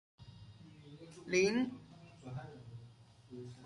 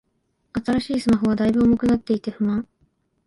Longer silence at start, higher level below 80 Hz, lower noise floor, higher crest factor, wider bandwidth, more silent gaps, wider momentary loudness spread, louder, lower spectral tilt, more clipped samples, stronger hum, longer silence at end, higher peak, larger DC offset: second, 0.2 s vs 0.55 s; second, -70 dBFS vs -46 dBFS; second, -59 dBFS vs -70 dBFS; first, 22 dB vs 14 dB; about the same, 11.5 kHz vs 11.5 kHz; neither; first, 25 LU vs 10 LU; second, -36 LUFS vs -21 LUFS; second, -5 dB/octave vs -7 dB/octave; neither; neither; second, 0 s vs 0.65 s; second, -20 dBFS vs -8 dBFS; neither